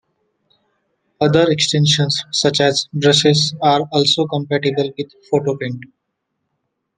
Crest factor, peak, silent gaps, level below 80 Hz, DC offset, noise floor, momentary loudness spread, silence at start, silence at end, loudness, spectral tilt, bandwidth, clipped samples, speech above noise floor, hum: 18 dB; 0 dBFS; none; -58 dBFS; under 0.1%; -74 dBFS; 9 LU; 1.2 s; 1.1 s; -16 LUFS; -4.5 dB/octave; 9.8 kHz; under 0.1%; 58 dB; none